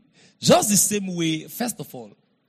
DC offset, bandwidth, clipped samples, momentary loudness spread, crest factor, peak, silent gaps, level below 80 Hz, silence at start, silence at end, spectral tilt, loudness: under 0.1%; 15.5 kHz; under 0.1%; 20 LU; 18 dB; -6 dBFS; none; -62 dBFS; 0.4 s; 0.4 s; -3.5 dB/octave; -20 LUFS